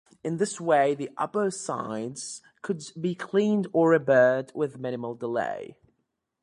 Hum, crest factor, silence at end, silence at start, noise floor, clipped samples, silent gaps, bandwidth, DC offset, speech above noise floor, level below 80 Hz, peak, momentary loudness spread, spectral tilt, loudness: none; 18 dB; 0.7 s; 0.25 s; -78 dBFS; under 0.1%; none; 11.5 kHz; under 0.1%; 52 dB; -72 dBFS; -8 dBFS; 14 LU; -5.5 dB/octave; -26 LUFS